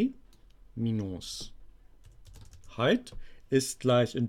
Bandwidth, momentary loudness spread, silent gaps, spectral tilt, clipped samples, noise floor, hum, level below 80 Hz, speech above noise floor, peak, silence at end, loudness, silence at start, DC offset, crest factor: 16 kHz; 20 LU; none; -5.5 dB/octave; under 0.1%; -55 dBFS; none; -52 dBFS; 26 dB; -14 dBFS; 0 s; -30 LUFS; 0 s; under 0.1%; 18 dB